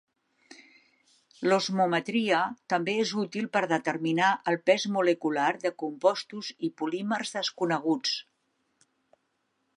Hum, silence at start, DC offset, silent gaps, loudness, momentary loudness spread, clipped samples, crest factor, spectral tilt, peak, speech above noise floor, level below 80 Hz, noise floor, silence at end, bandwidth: none; 0.5 s; under 0.1%; none; -28 LUFS; 7 LU; under 0.1%; 22 dB; -4.5 dB/octave; -8 dBFS; 49 dB; -82 dBFS; -76 dBFS; 1.55 s; 11.5 kHz